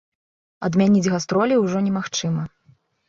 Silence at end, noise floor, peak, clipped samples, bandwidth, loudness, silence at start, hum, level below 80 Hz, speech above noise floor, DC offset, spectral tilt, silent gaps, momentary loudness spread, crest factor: 0.6 s; -58 dBFS; -6 dBFS; under 0.1%; 7.6 kHz; -20 LUFS; 0.6 s; none; -58 dBFS; 38 dB; under 0.1%; -6 dB/octave; none; 10 LU; 16 dB